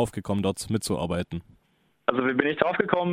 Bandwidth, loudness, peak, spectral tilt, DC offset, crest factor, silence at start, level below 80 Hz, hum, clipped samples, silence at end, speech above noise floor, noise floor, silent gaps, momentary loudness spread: 16 kHz; -26 LUFS; -4 dBFS; -5.5 dB/octave; under 0.1%; 22 dB; 0 s; -52 dBFS; none; under 0.1%; 0 s; 42 dB; -68 dBFS; none; 7 LU